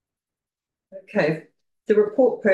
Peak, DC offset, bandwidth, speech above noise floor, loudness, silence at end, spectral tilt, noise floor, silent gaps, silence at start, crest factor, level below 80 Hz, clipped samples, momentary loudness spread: -6 dBFS; under 0.1%; 7.6 kHz; 70 dB; -22 LUFS; 0 s; -8 dB/octave; -90 dBFS; none; 0.95 s; 16 dB; -72 dBFS; under 0.1%; 12 LU